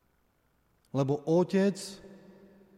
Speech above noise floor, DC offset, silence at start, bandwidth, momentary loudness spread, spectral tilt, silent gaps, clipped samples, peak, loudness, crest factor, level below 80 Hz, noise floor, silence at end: 43 dB; under 0.1%; 0.95 s; 14 kHz; 16 LU; -7 dB/octave; none; under 0.1%; -16 dBFS; -29 LUFS; 16 dB; -70 dBFS; -71 dBFS; 0.6 s